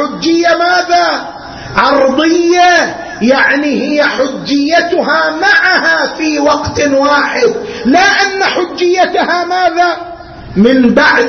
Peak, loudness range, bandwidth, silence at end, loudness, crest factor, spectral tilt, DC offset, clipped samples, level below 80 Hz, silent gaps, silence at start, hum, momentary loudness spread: 0 dBFS; 1 LU; 6.6 kHz; 0 s; -10 LUFS; 10 dB; -4 dB/octave; under 0.1%; under 0.1%; -42 dBFS; none; 0 s; none; 8 LU